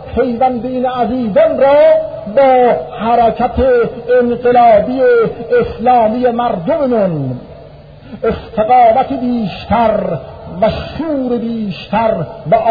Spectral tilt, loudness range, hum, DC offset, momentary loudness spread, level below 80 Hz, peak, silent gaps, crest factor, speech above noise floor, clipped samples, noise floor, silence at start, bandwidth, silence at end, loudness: -9.5 dB/octave; 4 LU; none; 0.1%; 10 LU; -36 dBFS; 0 dBFS; none; 12 dB; 23 dB; under 0.1%; -35 dBFS; 0 s; 5 kHz; 0 s; -12 LUFS